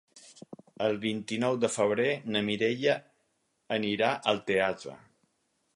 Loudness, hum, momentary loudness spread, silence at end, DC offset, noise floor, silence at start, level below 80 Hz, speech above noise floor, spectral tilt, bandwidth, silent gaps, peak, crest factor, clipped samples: -29 LUFS; none; 7 LU; 0.8 s; under 0.1%; -75 dBFS; 0.15 s; -70 dBFS; 47 dB; -4.5 dB/octave; 11.5 kHz; none; -10 dBFS; 20 dB; under 0.1%